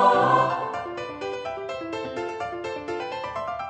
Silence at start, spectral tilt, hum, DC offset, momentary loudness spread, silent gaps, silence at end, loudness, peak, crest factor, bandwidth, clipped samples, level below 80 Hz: 0 s; -5.5 dB/octave; none; under 0.1%; 12 LU; none; 0 s; -27 LUFS; -6 dBFS; 20 dB; 8.6 kHz; under 0.1%; -60 dBFS